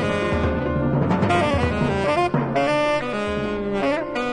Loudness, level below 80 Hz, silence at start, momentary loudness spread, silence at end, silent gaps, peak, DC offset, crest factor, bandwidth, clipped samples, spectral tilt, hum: -21 LUFS; -38 dBFS; 0 s; 5 LU; 0 s; none; -6 dBFS; under 0.1%; 14 dB; 11 kHz; under 0.1%; -7 dB/octave; none